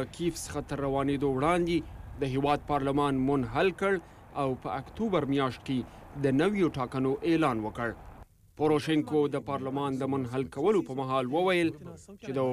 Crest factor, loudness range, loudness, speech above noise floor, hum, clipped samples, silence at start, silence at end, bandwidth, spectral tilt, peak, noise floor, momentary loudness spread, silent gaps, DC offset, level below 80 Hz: 14 dB; 2 LU; -29 LUFS; 22 dB; none; under 0.1%; 0 s; 0 s; 15 kHz; -6.5 dB/octave; -16 dBFS; -51 dBFS; 9 LU; none; under 0.1%; -52 dBFS